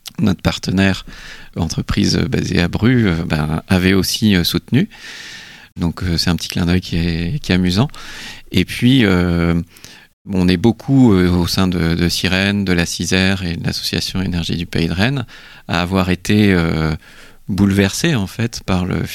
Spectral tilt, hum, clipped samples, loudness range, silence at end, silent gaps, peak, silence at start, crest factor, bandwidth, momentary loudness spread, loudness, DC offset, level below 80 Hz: -5.5 dB/octave; none; under 0.1%; 3 LU; 0 s; 10.13-10.25 s; 0 dBFS; 0.05 s; 16 dB; 16 kHz; 11 LU; -16 LUFS; under 0.1%; -34 dBFS